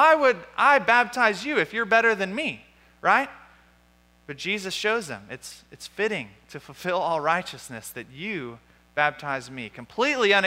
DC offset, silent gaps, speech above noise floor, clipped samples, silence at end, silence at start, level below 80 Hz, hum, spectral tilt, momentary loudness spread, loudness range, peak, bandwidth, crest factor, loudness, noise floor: under 0.1%; none; 35 dB; under 0.1%; 0 s; 0 s; -64 dBFS; 60 Hz at -60 dBFS; -3.5 dB/octave; 20 LU; 8 LU; -6 dBFS; 16 kHz; 20 dB; -24 LUFS; -59 dBFS